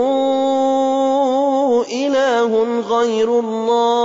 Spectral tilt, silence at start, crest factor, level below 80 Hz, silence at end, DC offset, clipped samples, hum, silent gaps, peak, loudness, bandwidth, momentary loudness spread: -4 dB/octave; 0 s; 10 dB; -64 dBFS; 0 s; under 0.1%; under 0.1%; none; none; -6 dBFS; -16 LUFS; 7.8 kHz; 2 LU